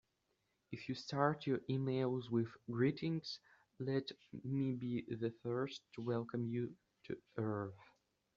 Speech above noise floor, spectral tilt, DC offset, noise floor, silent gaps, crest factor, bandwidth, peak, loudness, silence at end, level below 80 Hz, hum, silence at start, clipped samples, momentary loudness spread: 43 dB; -6.5 dB/octave; under 0.1%; -83 dBFS; none; 22 dB; 7.4 kHz; -18 dBFS; -41 LUFS; 0.55 s; -78 dBFS; none; 0.7 s; under 0.1%; 12 LU